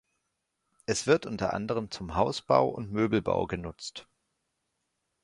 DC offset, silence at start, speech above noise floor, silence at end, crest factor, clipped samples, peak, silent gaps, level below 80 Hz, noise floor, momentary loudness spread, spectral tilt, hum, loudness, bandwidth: under 0.1%; 0.9 s; 52 dB; 1.2 s; 24 dB; under 0.1%; -6 dBFS; none; -54 dBFS; -81 dBFS; 15 LU; -5 dB/octave; none; -29 LUFS; 11.5 kHz